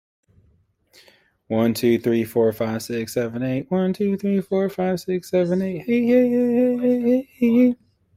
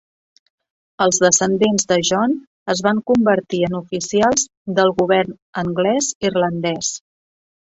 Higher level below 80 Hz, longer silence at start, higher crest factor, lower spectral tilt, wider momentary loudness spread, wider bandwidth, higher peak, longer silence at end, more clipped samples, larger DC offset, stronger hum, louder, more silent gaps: second, -60 dBFS vs -54 dBFS; first, 1.5 s vs 1 s; about the same, 14 dB vs 18 dB; first, -7 dB/octave vs -3.5 dB/octave; about the same, 8 LU vs 9 LU; first, 16 kHz vs 8.2 kHz; second, -6 dBFS vs 0 dBFS; second, 0.4 s vs 0.75 s; neither; neither; neither; second, -21 LUFS vs -18 LUFS; second, none vs 2.47-2.66 s, 4.57-4.65 s, 5.42-5.53 s, 6.15-6.21 s